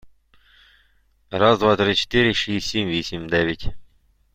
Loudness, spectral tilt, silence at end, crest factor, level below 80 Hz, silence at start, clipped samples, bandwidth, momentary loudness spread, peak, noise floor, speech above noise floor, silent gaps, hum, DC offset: -20 LUFS; -5 dB/octave; 0.5 s; 20 dB; -42 dBFS; 0.05 s; under 0.1%; 16 kHz; 11 LU; -2 dBFS; -60 dBFS; 40 dB; none; none; under 0.1%